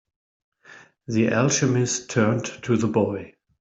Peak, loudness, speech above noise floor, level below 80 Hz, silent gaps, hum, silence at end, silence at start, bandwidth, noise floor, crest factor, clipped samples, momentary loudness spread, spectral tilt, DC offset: -6 dBFS; -22 LUFS; 28 dB; -60 dBFS; none; none; 0.35 s; 0.7 s; 8.2 kHz; -50 dBFS; 18 dB; under 0.1%; 8 LU; -5 dB/octave; under 0.1%